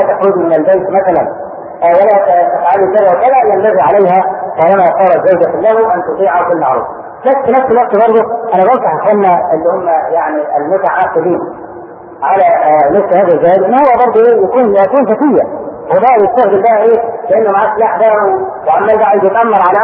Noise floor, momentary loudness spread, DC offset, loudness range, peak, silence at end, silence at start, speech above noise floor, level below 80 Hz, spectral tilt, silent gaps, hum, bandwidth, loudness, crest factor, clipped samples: -29 dBFS; 6 LU; under 0.1%; 3 LU; 0 dBFS; 0 s; 0 s; 20 dB; -50 dBFS; -10 dB/octave; none; none; 3.8 kHz; -9 LUFS; 8 dB; under 0.1%